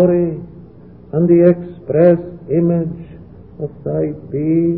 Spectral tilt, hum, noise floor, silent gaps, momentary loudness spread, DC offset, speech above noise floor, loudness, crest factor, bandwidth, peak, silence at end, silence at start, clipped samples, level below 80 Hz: -15 dB/octave; none; -39 dBFS; none; 17 LU; 0.3%; 25 dB; -16 LUFS; 16 dB; 3 kHz; 0 dBFS; 0 s; 0 s; under 0.1%; -46 dBFS